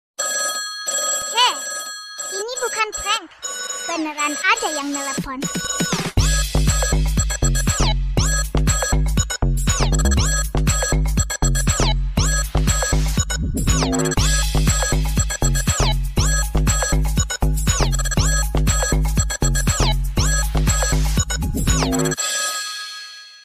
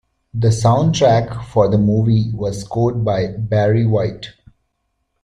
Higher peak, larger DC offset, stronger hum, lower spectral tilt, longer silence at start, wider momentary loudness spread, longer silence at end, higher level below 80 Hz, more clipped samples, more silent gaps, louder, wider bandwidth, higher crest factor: about the same, -4 dBFS vs -2 dBFS; neither; neither; second, -3.5 dB/octave vs -7 dB/octave; second, 0.2 s vs 0.35 s; second, 6 LU vs 9 LU; second, 0.05 s vs 0.95 s; first, -22 dBFS vs -42 dBFS; neither; neither; second, -20 LUFS vs -16 LUFS; first, 16 kHz vs 10.5 kHz; about the same, 14 dB vs 16 dB